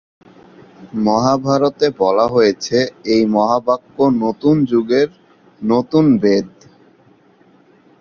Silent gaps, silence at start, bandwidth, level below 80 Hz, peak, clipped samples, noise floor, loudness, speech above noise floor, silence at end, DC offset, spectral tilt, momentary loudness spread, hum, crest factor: none; 0.8 s; 7.2 kHz; -54 dBFS; 0 dBFS; under 0.1%; -51 dBFS; -15 LUFS; 36 dB; 1.55 s; under 0.1%; -6.5 dB/octave; 6 LU; none; 16 dB